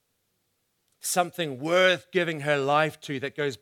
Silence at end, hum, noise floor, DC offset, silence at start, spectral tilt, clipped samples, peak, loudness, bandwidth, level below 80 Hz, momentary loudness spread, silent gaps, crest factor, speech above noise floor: 0.05 s; none; -75 dBFS; under 0.1%; 1.05 s; -3.5 dB/octave; under 0.1%; -8 dBFS; -25 LUFS; 18.5 kHz; -78 dBFS; 10 LU; none; 20 dB; 49 dB